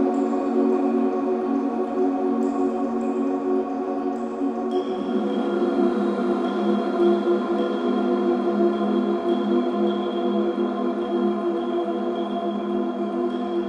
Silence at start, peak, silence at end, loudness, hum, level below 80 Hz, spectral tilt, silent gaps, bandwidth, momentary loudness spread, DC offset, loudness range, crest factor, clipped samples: 0 s; -8 dBFS; 0 s; -23 LUFS; none; -66 dBFS; -8 dB/octave; none; 8.2 kHz; 5 LU; under 0.1%; 3 LU; 14 dB; under 0.1%